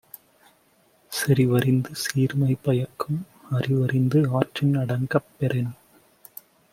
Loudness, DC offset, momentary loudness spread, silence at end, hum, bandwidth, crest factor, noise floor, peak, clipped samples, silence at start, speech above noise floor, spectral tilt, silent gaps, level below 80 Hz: -24 LUFS; under 0.1%; 12 LU; 1 s; none; 16 kHz; 22 dB; -61 dBFS; -2 dBFS; under 0.1%; 1.1 s; 39 dB; -6.5 dB/octave; none; -60 dBFS